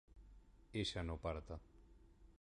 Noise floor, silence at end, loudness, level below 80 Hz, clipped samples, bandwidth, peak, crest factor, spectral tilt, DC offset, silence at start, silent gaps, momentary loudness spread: -65 dBFS; 0.1 s; -46 LUFS; -56 dBFS; under 0.1%; 11 kHz; -28 dBFS; 20 dB; -5 dB/octave; under 0.1%; 0.1 s; none; 24 LU